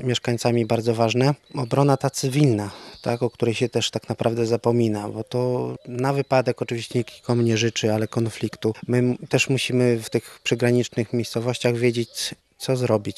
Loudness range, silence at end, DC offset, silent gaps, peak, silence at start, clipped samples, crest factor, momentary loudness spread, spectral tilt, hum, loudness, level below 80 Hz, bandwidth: 2 LU; 0.05 s; under 0.1%; none; -2 dBFS; 0 s; under 0.1%; 20 dB; 7 LU; -5.5 dB/octave; none; -23 LUFS; -64 dBFS; 13.5 kHz